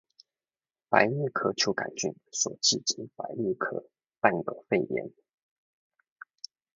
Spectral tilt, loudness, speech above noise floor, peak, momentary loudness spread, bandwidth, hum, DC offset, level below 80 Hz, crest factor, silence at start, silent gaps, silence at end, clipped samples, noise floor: -2.5 dB/octave; -28 LUFS; over 61 dB; -4 dBFS; 14 LU; 7.8 kHz; none; under 0.1%; -72 dBFS; 28 dB; 0.9 s; none; 1.65 s; under 0.1%; under -90 dBFS